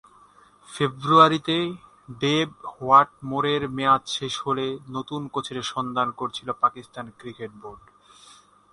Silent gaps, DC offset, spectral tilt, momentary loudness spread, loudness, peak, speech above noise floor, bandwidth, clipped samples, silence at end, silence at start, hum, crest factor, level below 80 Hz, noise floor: none; under 0.1%; -5 dB/octave; 21 LU; -23 LUFS; -2 dBFS; 30 dB; 11.5 kHz; under 0.1%; 0.95 s; 0.7 s; 50 Hz at -60 dBFS; 22 dB; -62 dBFS; -54 dBFS